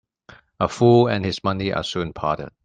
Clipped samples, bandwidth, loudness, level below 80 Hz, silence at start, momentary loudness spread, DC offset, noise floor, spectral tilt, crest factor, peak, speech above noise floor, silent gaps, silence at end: under 0.1%; 9.2 kHz; -21 LUFS; -50 dBFS; 0.6 s; 10 LU; under 0.1%; -50 dBFS; -6.5 dB/octave; 18 dB; -2 dBFS; 30 dB; none; 0.15 s